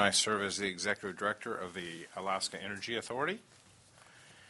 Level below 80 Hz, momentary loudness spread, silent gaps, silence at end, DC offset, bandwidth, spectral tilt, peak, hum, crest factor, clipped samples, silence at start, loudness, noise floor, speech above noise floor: -74 dBFS; 10 LU; none; 0 s; under 0.1%; 11.5 kHz; -2 dB/octave; -12 dBFS; none; 26 dB; under 0.1%; 0 s; -35 LUFS; -61 dBFS; 25 dB